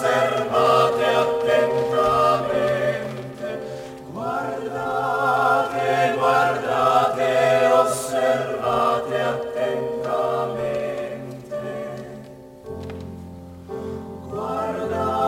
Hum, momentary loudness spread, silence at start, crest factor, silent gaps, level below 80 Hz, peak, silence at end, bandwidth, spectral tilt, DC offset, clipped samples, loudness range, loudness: none; 17 LU; 0 s; 18 dB; none; -54 dBFS; -4 dBFS; 0 s; 16.5 kHz; -5 dB/octave; under 0.1%; under 0.1%; 12 LU; -21 LUFS